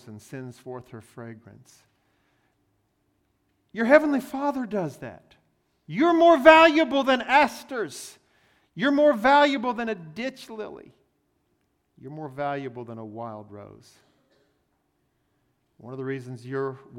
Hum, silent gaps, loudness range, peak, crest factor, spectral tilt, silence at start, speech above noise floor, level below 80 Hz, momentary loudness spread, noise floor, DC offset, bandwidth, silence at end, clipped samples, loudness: none; none; 21 LU; 0 dBFS; 26 dB; -5 dB/octave; 0.05 s; 48 dB; -64 dBFS; 24 LU; -72 dBFS; under 0.1%; 16 kHz; 0 s; under 0.1%; -21 LUFS